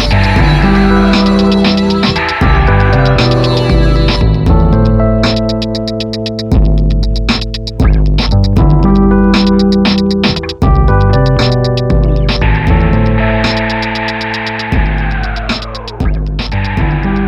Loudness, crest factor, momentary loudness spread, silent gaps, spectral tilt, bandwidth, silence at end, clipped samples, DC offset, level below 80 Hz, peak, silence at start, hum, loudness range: -11 LUFS; 10 dB; 8 LU; none; -7 dB/octave; 7.8 kHz; 0 s; under 0.1%; under 0.1%; -14 dBFS; 0 dBFS; 0 s; none; 4 LU